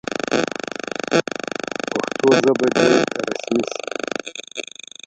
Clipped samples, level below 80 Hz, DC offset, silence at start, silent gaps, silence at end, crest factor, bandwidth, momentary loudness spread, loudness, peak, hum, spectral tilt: under 0.1%; -60 dBFS; under 0.1%; 0.1 s; none; 0.45 s; 20 dB; 9.2 kHz; 13 LU; -20 LUFS; 0 dBFS; none; -4 dB/octave